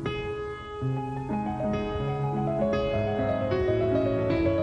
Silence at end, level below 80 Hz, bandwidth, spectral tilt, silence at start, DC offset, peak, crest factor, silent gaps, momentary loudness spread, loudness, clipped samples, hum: 0 s; -44 dBFS; 9.2 kHz; -8.5 dB/octave; 0 s; under 0.1%; -14 dBFS; 12 dB; none; 7 LU; -28 LUFS; under 0.1%; none